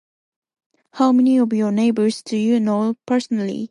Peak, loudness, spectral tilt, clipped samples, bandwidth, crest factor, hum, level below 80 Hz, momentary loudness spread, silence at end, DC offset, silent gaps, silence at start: -4 dBFS; -18 LUFS; -6.5 dB/octave; under 0.1%; 11.5 kHz; 14 dB; none; -70 dBFS; 7 LU; 0.05 s; under 0.1%; none; 0.95 s